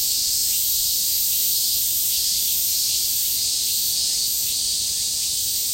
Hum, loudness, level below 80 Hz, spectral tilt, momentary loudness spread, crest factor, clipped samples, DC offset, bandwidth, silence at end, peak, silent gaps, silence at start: none; -18 LUFS; -52 dBFS; 2 dB/octave; 2 LU; 14 dB; under 0.1%; under 0.1%; 16.5 kHz; 0 s; -8 dBFS; none; 0 s